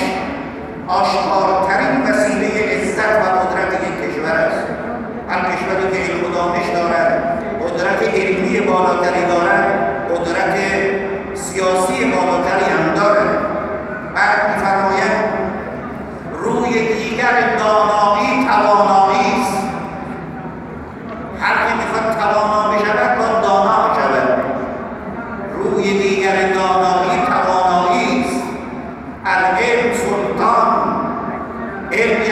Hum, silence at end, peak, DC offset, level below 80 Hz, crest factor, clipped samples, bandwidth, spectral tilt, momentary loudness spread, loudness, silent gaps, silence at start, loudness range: none; 0 s; -2 dBFS; under 0.1%; -44 dBFS; 16 dB; under 0.1%; 14 kHz; -5 dB/octave; 12 LU; -16 LUFS; none; 0 s; 3 LU